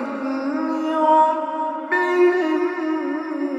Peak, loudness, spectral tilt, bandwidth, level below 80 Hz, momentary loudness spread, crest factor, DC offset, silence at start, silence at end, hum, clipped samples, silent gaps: -6 dBFS; -20 LUFS; -4.5 dB/octave; 8 kHz; -78 dBFS; 9 LU; 14 dB; under 0.1%; 0 s; 0 s; none; under 0.1%; none